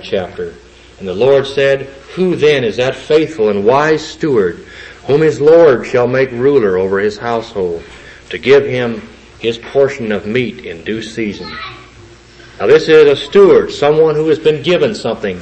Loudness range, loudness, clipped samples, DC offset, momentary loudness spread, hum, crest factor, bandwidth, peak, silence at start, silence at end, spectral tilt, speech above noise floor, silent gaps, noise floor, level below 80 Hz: 6 LU; -12 LUFS; under 0.1%; under 0.1%; 17 LU; none; 12 dB; 8.6 kHz; 0 dBFS; 0 s; 0 s; -6 dB/octave; 27 dB; none; -39 dBFS; -46 dBFS